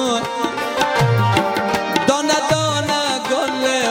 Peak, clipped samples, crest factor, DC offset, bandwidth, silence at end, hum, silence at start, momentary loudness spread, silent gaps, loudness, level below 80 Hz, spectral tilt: 0 dBFS; under 0.1%; 18 dB; under 0.1%; 17 kHz; 0 s; none; 0 s; 4 LU; none; -18 LUFS; -48 dBFS; -4 dB/octave